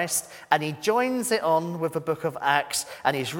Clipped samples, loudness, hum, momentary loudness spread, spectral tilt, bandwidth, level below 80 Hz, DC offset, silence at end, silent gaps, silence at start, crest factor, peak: under 0.1%; -25 LUFS; none; 6 LU; -3.5 dB/octave; 18 kHz; -68 dBFS; under 0.1%; 0 s; none; 0 s; 22 dB; -2 dBFS